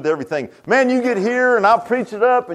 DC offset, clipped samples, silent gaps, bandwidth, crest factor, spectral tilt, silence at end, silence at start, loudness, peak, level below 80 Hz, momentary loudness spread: under 0.1%; under 0.1%; none; 10.5 kHz; 14 dB; -5.5 dB/octave; 0 s; 0 s; -17 LUFS; -2 dBFS; -62 dBFS; 8 LU